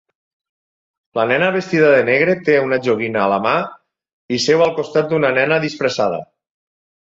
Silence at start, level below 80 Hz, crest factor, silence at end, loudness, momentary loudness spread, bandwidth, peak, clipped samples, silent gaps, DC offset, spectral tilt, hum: 1.15 s; -60 dBFS; 16 dB; 0.8 s; -16 LUFS; 8 LU; 7.8 kHz; -2 dBFS; under 0.1%; 4.13-4.29 s; under 0.1%; -5 dB/octave; none